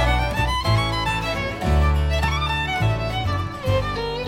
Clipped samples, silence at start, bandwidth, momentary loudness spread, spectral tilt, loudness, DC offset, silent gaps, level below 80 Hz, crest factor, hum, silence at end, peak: under 0.1%; 0 s; 16 kHz; 4 LU; -5.5 dB/octave; -22 LUFS; under 0.1%; none; -26 dBFS; 14 dB; none; 0 s; -8 dBFS